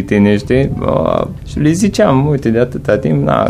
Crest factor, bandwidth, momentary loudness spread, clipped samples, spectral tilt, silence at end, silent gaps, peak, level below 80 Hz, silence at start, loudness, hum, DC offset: 12 dB; 14 kHz; 5 LU; under 0.1%; -7 dB/octave; 0 s; none; 0 dBFS; -32 dBFS; 0 s; -13 LUFS; none; under 0.1%